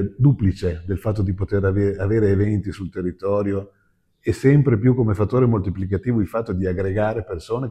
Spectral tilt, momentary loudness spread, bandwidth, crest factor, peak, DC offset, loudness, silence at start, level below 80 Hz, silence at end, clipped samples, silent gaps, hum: -9.5 dB/octave; 9 LU; 10 kHz; 16 dB; -4 dBFS; under 0.1%; -21 LUFS; 0 s; -42 dBFS; 0 s; under 0.1%; none; none